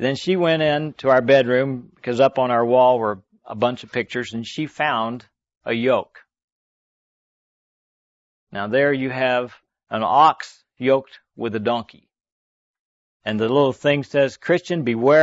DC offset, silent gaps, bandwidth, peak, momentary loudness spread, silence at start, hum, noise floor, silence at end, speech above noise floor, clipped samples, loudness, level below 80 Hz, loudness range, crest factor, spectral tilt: under 0.1%; 5.57-5.61 s, 6.44-8.47 s, 12.32-13.20 s; 8 kHz; -4 dBFS; 14 LU; 0 s; none; under -90 dBFS; 0 s; over 71 dB; under 0.1%; -20 LUFS; -64 dBFS; 8 LU; 18 dB; -6 dB/octave